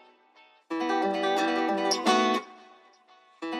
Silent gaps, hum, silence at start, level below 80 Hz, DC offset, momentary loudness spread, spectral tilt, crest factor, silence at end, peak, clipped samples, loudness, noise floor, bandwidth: none; none; 0.7 s; -84 dBFS; under 0.1%; 13 LU; -3 dB/octave; 18 dB; 0 s; -10 dBFS; under 0.1%; -26 LUFS; -59 dBFS; 14 kHz